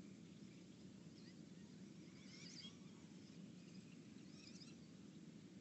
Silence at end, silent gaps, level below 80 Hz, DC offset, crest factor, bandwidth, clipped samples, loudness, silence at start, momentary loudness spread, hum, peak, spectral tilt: 0 s; none; -88 dBFS; under 0.1%; 14 dB; 8.2 kHz; under 0.1%; -60 LUFS; 0 s; 4 LU; none; -46 dBFS; -4.5 dB/octave